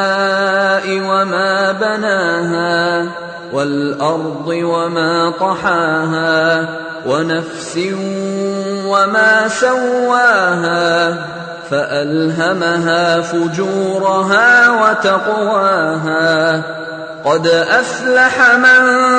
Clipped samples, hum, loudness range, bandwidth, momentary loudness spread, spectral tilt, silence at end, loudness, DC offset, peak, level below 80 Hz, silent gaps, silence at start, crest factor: under 0.1%; none; 4 LU; 9.2 kHz; 11 LU; -4.5 dB/octave; 0 s; -13 LUFS; under 0.1%; 0 dBFS; -58 dBFS; none; 0 s; 12 dB